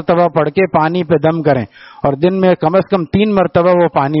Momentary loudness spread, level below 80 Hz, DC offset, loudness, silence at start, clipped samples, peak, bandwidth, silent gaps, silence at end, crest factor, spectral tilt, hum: 4 LU; -46 dBFS; under 0.1%; -13 LUFS; 0 s; under 0.1%; 0 dBFS; 5.8 kHz; none; 0 s; 12 dB; -6.5 dB/octave; none